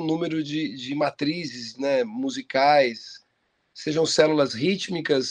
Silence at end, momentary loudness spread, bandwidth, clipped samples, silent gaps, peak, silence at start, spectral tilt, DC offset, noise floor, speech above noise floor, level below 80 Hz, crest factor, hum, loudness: 0 s; 11 LU; 10.5 kHz; under 0.1%; none; -2 dBFS; 0 s; -4.5 dB/octave; under 0.1%; -71 dBFS; 48 dB; -68 dBFS; 22 dB; none; -24 LUFS